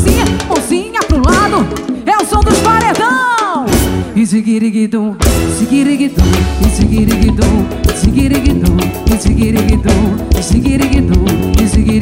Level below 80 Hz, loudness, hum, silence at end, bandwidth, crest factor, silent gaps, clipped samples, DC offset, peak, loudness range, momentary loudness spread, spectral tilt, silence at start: -16 dBFS; -11 LUFS; none; 0 s; 16.5 kHz; 10 dB; none; under 0.1%; under 0.1%; 0 dBFS; 1 LU; 4 LU; -5.5 dB/octave; 0 s